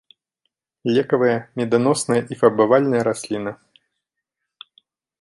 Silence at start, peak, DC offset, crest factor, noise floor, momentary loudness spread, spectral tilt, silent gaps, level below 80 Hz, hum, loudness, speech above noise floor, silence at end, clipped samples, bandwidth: 0.85 s; -2 dBFS; under 0.1%; 18 dB; -81 dBFS; 11 LU; -5.5 dB/octave; none; -64 dBFS; none; -19 LUFS; 63 dB; 1.7 s; under 0.1%; 11.5 kHz